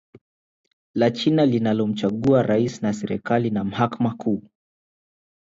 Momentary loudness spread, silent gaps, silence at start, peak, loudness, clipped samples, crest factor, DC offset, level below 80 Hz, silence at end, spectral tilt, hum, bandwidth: 8 LU; 0.21-0.64 s, 0.73-0.94 s; 0.15 s; -6 dBFS; -22 LUFS; under 0.1%; 16 dB; under 0.1%; -58 dBFS; 1.15 s; -7 dB/octave; none; 7.8 kHz